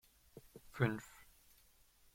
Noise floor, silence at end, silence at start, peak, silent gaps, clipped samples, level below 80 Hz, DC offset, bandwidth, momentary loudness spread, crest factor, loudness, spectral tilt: -69 dBFS; 0.9 s; 0.35 s; -18 dBFS; none; under 0.1%; -70 dBFS; under 0.1%; 16.5 kHz; 24 LU; 26 dB; -40 LUFS; -7 dB/octave